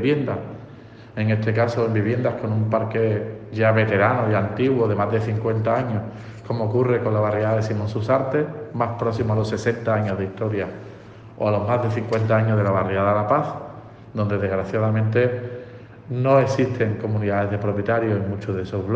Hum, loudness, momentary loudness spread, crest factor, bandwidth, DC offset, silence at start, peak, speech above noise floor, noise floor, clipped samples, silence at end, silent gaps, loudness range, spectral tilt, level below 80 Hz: none; -22 LUFS; 12 LU; 18 dB; 7.4 kHz; under 0.1%; 0 s; -4 dBFS; 21 dB; -42 dBFS; under 0.1%; 0 s; none; 3 LU; -8.5 dB/octave; -54 dBFS